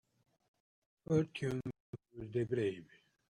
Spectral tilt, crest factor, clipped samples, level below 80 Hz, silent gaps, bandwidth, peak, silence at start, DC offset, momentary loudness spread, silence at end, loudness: -7.5 dB/octave; 20 dB; under 0.1%; -70 dBFS; 1.80-1.93 s; 11 kHz; -20 dBFS; 1.1 s; under 0.1%; 18 LU; 0.55 s; -38 LUFS